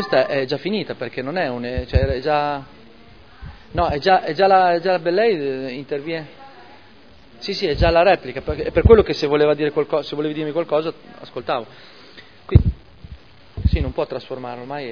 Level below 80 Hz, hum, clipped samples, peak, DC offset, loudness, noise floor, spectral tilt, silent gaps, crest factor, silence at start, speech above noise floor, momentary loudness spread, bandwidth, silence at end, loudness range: -30 dBFS; none; under 0.1%; 0 dBFS; 0.4%; -20 LUFS; -48 dBFS; -7.5 dB/octave; none; 20 dB; 0 s; 29 dB; 16 LU; 5.4 kHz; 0 s; 6 LU